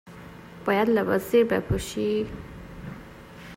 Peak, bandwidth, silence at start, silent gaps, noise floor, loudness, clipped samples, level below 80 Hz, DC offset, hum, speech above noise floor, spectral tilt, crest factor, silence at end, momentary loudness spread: -10 dBFS; 16 kHz; 0.05 s; none; -44 dBFS; -25 LUFS; under 0.1%; -46 dBFS; under 0.1%; none; 20 dB; -6 dB/octave; 16 dB; 0 s; 22 LU